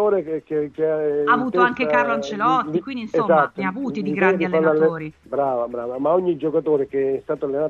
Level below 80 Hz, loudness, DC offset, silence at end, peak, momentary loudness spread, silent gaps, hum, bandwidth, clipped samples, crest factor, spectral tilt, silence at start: -60 dBFS; -21 LUFS; under 0.1%; 0 s; -2 dBFS; 8 LU; none; none; 7.2 kHz; under 0.1%; 18 dB; -7 dB/octave; 0 s